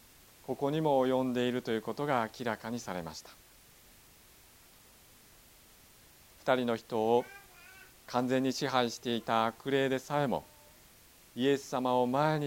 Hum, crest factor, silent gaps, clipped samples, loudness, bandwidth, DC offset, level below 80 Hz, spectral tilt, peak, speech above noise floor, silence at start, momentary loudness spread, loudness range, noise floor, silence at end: none; 22 dB; none; under 0.1%; -32 LUFS; 17 kHz; under 0.1%; -68 dBFS; -5.5 dB/octave; -12 dBFS; 28 dB; 0.5 s; 18 LU; 11 LU; -59 dBFS; 0 s